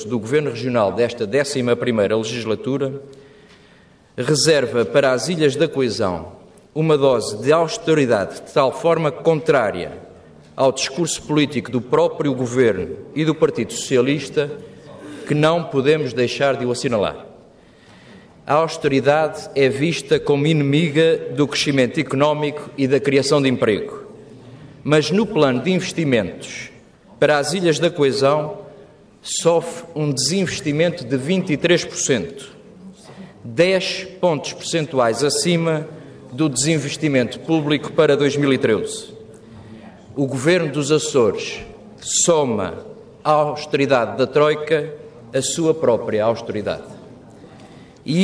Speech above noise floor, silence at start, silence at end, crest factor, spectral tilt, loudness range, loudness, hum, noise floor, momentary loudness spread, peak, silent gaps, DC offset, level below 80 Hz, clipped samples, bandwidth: 32 dB; 0 s; 0 s; 16 dB; -4.5 dB/octave; 3 LU; -19 LUFS; none; -50 dBFS; 14 LU; -2 dBFS; none; under 0.1%; -56 dBFS; under 0.1%; 11 kHz